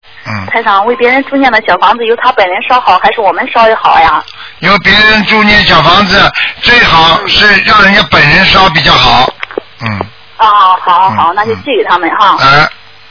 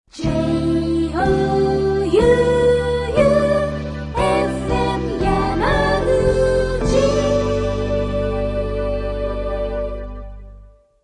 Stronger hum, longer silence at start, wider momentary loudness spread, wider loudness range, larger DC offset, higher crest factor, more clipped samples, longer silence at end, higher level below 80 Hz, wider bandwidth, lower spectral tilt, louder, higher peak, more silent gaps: neither; about the same, 0.15 s vs 0.15 s; about the same, 10 LU vs 9 LU; about the same, 4 LU vs 5 LU; first, 1% vs under 0.1%; second, 6 dB vs 16 dB; first, 5% vs under 0.1%; about the same, 0.4 s vs 0.35 s; about the same, -30 dBFS vs -28 dBFS; second, 5.4 kHz vs 11 kHz; second, -4.5 dB/octave vs -6.5 dB/octave; first, -5 LUFS vs -18 LUFS; about the same, 0 dBFS vs -2 dBFS; neither